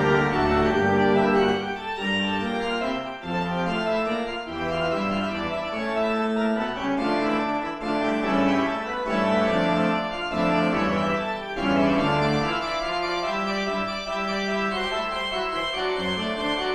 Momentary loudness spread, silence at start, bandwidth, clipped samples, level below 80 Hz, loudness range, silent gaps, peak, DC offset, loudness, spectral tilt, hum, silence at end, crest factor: 7 LU; 0 s; 11 kHz; under 0.1%; -46 dBFS; 3 LU; none; -8 dBFS; under 0.1%; -24 LUFS; -6 dB/octave; none; 0 s; 16 dB